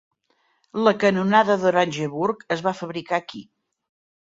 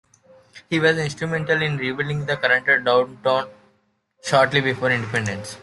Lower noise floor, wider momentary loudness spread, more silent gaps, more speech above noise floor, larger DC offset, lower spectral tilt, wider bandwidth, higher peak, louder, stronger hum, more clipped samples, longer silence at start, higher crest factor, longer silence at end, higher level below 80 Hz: about the same, -67 dBFS vs -66 dBFS; first, 14 LU vs 8 LU; neither; about the same, 46 dB vs 45 dB; neither; about the same, -5.5 dB/octave vs -5 dB/octave; second, 7.8 kHz vs 12 kHz; about the same, -2 dBFS vs -4 dBFS; about the same, -21 LUFS vs -20 LUFS; neither; neither; first, 0.75 s vs 0.55 s; about the same, 20 dB vs 18 dB; first, 0.8 s vs 0 s; second, -66 dBFS vs -58 dBFS